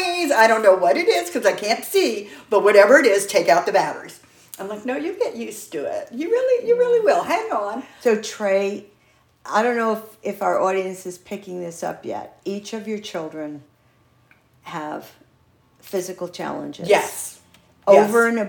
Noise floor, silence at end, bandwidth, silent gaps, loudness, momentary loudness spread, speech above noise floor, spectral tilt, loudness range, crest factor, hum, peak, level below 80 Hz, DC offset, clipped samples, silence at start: -58 dBFS; 0 s; 19 kHz; none; -20 LUFS; 18 LU; 39 dB; -3.5 dB/octave; 16 LU; 20 dB; none; 0 dBFS; -70 dBFS; under 0.1%; under 0.1%; 0 s